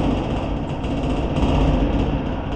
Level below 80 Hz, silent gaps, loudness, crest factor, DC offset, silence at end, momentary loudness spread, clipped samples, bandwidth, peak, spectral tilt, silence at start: -26 dBFS; none; -22 LUFS; 14 dB; under 0.1%; 0 s; 6 LU; under 0.1%; 8.6 kHz; -6 dBFS; -8 dB/octave; 0 s